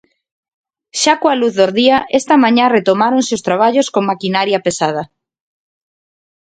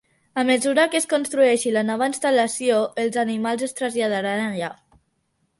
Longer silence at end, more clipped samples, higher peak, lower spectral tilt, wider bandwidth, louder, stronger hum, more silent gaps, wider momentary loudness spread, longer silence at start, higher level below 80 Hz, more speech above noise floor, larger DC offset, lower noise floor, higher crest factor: first, 1.45 s vs 0.85 s; neither; first, 0 dBFS vs -4 dBFS; about the same, -4 dB/octave vs -3.5 dB/octave; second, 9.4 kHz vs 11.5 kHz; first, -13 LUFS vs -21 LUFS; neither; neither; about the same, 7 LU vs 7 LU; first, 0.95 s vs 0.35 s; first, -58 dBFS vs -68 dBFS; first, over 77 dB vs 49 dB; neither; first, under -90 dBFS vs -70 dBFS; about the same, 14 dB vs 16 dB